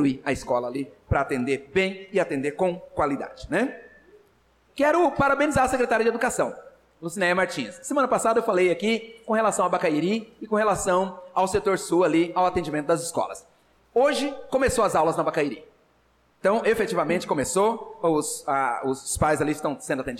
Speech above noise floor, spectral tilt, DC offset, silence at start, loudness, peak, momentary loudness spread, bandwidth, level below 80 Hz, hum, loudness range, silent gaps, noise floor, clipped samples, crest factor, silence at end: 39 dB; -4.5 dB/octave; under 0.1%; 0 s; -24 LUFS; -12 dBFS; 8 LU; 16 kHz; -48 dBFS; none; 3 LU; none; -63 dBFS; under 0.1%; 12 dB; 0 s